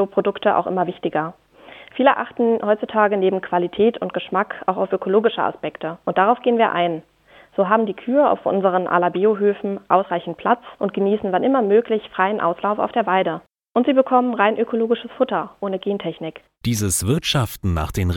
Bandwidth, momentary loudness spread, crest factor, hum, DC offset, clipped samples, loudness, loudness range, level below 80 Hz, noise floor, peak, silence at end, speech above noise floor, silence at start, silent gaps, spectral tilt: 18 kHz; 8 LU; 18 dB; none; under 0.1%; under 0.1%; -20 LUFS; 2 LU; -44 dBFS; -44 dBFS; -2 dBFS; 0 s; 24 dB; 0 s; none; -5.5 dB/octave